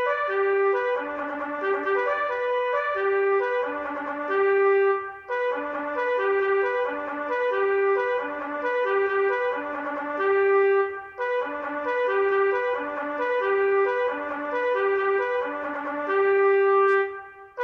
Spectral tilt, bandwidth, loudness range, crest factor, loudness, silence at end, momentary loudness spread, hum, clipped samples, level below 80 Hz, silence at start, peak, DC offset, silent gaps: -5 dB/octave; 5.8 kHz; 2 LU; 12 dB; -24 LUFS; 0 s; 9 LU; none; under 0.1%; -68 dBFS; 0 s; -12 dBFS; under 0.1%; none